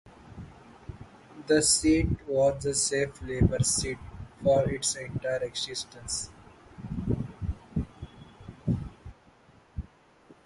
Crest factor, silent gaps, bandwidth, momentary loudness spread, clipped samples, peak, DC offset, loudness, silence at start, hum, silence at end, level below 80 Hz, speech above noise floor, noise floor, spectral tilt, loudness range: 22 dB; none; 12 kHz; 23 LU; under 0.1%; -8 dBFS; under 0.1%; -28 LUFS; 0.05 s; none; 0.15 s; -42 dBFS; 31 dB; -58 dBFS; -4 dB/octave; 10 LU